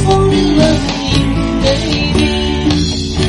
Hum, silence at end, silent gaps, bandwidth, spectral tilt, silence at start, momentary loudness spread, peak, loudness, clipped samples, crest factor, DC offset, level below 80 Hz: none; 0 s; none; 11.5 kHz; -5.5 dB/octave; 0 s; 4 LU; 0 dBFS; -13 LUFS; under 0.1%; 12 dB; under 0.1%; -22 dBFS